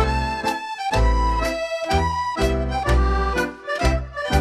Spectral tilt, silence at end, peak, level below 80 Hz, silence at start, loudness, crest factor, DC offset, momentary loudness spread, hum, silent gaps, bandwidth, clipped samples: -5.5 dB/octave; 0 s; -6 dBFS; -24 dBFS; 0 s; -22 LUFS; 16 dB; under 0.1%; 5 LU; none; none; 14 kHz; under 0.1%